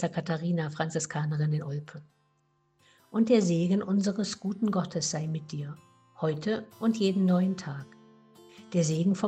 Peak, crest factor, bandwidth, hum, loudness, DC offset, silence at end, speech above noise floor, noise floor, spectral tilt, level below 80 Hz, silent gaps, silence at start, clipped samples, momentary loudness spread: -12 dBFS; 18 dB; 9 kHz; none; -29 LUFS; under 0.1%; 0 s; 43 dB; -71 dBFS; -6 dB/octave; -72 dBFS; none; 0 s; under 0.1%; 14 LU